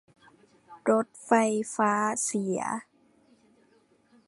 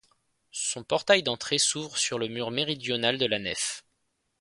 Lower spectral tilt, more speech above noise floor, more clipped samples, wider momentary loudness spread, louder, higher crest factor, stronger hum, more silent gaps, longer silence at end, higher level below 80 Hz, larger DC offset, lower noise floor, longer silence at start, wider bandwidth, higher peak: first, -4.5 dB/octave vs -2 dB/octave; second, 38 dB vs 48 dB; neither; about the same, 8 LU vs 8 LU; about the same, -27 LUFS vs -27 LUFS; about the same, 22 dB vs 24 dB; neither; neither; first, 1.45 s vs 0.6 s; second, -78 dBFS vs -66 dBFS; neither; second, -64 dBFS vs -76 dBFS; first, 0.7 s vs 0.55 s; about the same, 11.5 kHz vs 11.5 kHz; about the same, -8 dBFS vs -6 dBFS